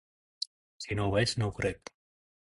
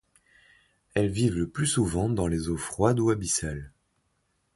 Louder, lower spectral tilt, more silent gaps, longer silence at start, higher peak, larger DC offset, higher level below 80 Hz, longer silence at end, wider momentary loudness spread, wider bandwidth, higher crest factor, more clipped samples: second, -32 LUFS vs -27 LUFS; about the same, -5 dB/octave vs -5 dB/octave; first, 0.47-0.80 s vs none; second, 0.4 s vs 0.95 s; second, -14 dBFS vs -8 dBFS; neither; second, -52 dBFS vs -44 dBFS; second, 0.65 s vs 0.85 s; first, 17 LU vs 7 LU; about the same, 11.5 kHz vs 11.5 kHz; about the same, 20 dB vs 20 dB; neither